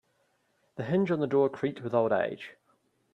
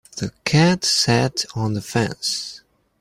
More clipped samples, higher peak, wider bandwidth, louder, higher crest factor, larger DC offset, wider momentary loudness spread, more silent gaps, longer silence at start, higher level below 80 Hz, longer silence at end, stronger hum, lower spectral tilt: neither; second, -12 dBFS vs -4 dBFS; second, 7 kHz vs 16 kHz; second, -28 LUFS vs -20 LUFS; about the same, 18 dB vs 18 dB; neither; first, 17 LU vs 10 LU; neither; first, 0.75 s vs 0.15 s; second, -72 dBFS vs -50 dBFS; first, 0.6 s vs 0.45 s; neither; first, -8.5 dB/octave vs -4 dB/octave